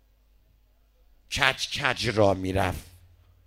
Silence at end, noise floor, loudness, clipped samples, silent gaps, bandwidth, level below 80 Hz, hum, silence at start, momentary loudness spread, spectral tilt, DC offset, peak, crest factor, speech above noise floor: 0.6 s; -62 dBFS; -25 LUFS; under 0.1%; none; 16 kHz; -48 dBFS; none; 1.3 s; 8 LU; -4 dB/octave; under 0.1%; -4 dBFS; 24 dB; 36 dB